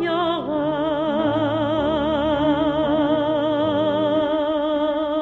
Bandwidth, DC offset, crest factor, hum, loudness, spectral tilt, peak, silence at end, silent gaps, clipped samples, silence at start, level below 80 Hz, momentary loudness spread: 6 kHz; under 0.1%; 14 dB; none; -21 LUFS; -8 dB/octave; -8 dBFS; 0 s; none; under 0.1%; 0 s; -46 dBFS; 3 LU